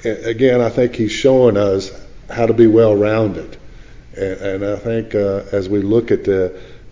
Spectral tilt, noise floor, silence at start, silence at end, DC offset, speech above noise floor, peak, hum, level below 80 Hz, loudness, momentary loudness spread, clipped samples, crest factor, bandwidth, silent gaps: -7 dB/octave; -37 dBFS; 0 s; 0.15 s; 0.6%; 22 dB; 0 dBFS; none; -40 dBFS; -16 LUFS; 12 LU; under 0.1%; 16 dB; 7.6 kHz; none